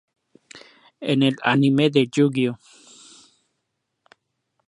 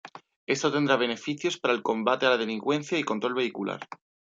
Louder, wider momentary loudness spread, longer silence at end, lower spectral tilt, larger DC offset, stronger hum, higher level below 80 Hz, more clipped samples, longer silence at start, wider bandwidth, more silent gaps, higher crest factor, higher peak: first, -20 LUFS vs -27 LUFS; about the same, 10 LU vs 10 LU; first, 2.1 s vs 0.35 s; first, -6.5 dB/octave vs -4 dB/octave; neither; neither; first, -70 dBFS vs -76 dBFS; neither; first, 0.55 s vs 0.05 s; first, 11 kHz vs 8 kHz; second, none vs 0.36-0.47 s; about the same, 22 dB vs 20 dB; first, -2 dBFS vs -8 dBFS